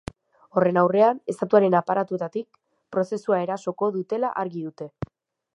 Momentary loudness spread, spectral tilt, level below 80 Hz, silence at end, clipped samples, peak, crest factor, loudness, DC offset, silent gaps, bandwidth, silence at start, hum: 17 LU; -7.5 dB/octave; -58 dBFS; 0.5 s; under 0.1%; -4 dBFS; 20 dB; -23 LUFS; under 0.1%; none; 11 kHz; 0.55 s; none